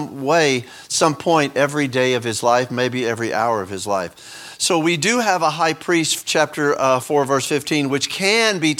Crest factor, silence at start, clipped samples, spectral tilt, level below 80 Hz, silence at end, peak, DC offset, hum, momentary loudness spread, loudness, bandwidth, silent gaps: 18 dB; 0 s; under 0.1%; -3.5 dB/octave; -64 dBFS; 0 s; 0 dBFS; under 0.1%; none; 7 LU; -18 LUFS; 18.5 kHz; none